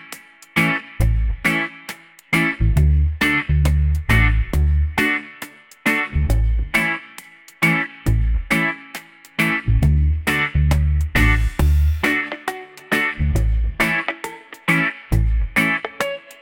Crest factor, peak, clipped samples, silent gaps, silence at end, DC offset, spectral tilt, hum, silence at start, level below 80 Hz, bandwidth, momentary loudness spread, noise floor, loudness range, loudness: 16 dB; -2 dBFS; under 0.1%; none; 0.1 s; under 0.1%; -5.5 dB/octave; none; 0 s; -22 dBFS; 17 kHz; 12 LU; -42 dBFS; 3 LU; -19 LUFS